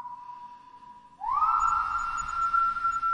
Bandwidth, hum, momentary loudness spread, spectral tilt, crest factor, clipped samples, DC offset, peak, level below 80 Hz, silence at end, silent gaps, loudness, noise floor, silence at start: 10 kHz; none; 20 LU; -1.5 dB/octave; 16 dB; under 0.1%; under 0.1%; -14 dBFS; -52 dBFS; 0 s; none; -26 LUFS; -50 dBFS; 0 s